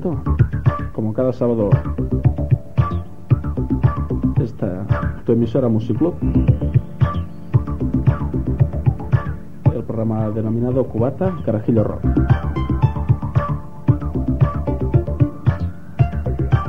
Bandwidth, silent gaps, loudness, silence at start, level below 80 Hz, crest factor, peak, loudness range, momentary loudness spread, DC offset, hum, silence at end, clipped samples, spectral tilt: 4.8 kHz; none; -20 LUFS; 0 s; -28 dBFS; 16 dB; -2 dBFS; 1 LU; 5 LU; 2%; none; 0 s; under 0.1%; -11 dB/octave